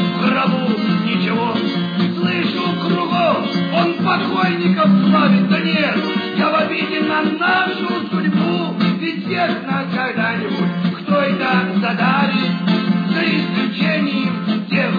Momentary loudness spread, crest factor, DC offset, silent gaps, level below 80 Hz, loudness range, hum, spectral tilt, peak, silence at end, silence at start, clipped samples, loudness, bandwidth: 5 LU; 14 dB; under 0.1%; none; -66 dBFS; 3 LU; none; -8 dB/octave; -2 dBFS; 0 s; 0 s; under 0.1%; -17 LUFS; 5 kHz